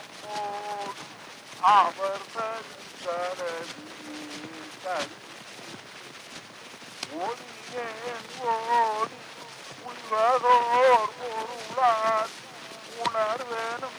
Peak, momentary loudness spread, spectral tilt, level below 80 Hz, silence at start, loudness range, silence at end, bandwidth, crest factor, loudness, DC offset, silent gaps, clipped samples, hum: -8 dBFS; 21 LU; -2.5 dB/octave; -76 dBFS; 0 s; 13 LU; 0 s; over 20 kHz; 20 dB; -27 LUFS; under 0.1%; none; under 0.1%; none